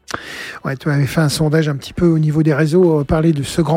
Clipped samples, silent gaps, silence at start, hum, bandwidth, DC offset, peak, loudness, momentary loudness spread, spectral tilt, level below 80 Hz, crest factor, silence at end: under 0.1%; none; 0.1 s; none; 16 kHz; under 0.1%; -2 dBFS; -16 LUFS; 12 LU; -6.5 dB/octave; -38 dBFS; 12 dB; 0 s